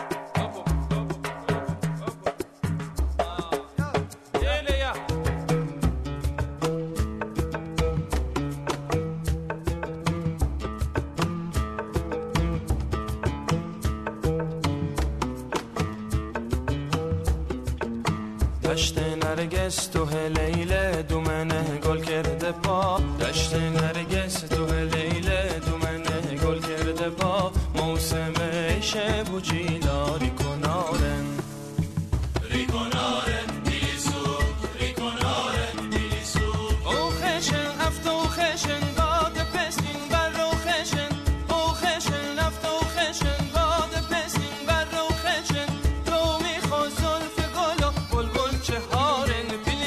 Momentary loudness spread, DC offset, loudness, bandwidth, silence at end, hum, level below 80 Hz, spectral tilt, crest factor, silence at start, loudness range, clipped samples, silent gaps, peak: 6 LU; under 0.1%; -27 LUFS; 13.5 kHz; 0 s; none; -32 dBFS; -5 dB/octave; 14 dB; 0 s; 4 LU; under 0.1%; none; -12 dBFS